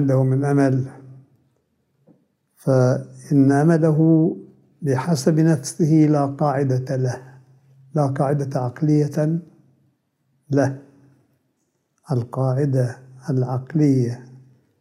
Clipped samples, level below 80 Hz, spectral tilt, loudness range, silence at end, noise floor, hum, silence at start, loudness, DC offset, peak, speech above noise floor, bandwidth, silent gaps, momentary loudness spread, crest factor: under 0.1%; -68 dBFS; -8 dB/octave; 7 LU; 0.45 s; -70 dBFS; none; 0 s; -20 LUFS; under 0.1%; -4 dBFS; 52 dB; 12.5 kHz; none; 11 LU; 16 dB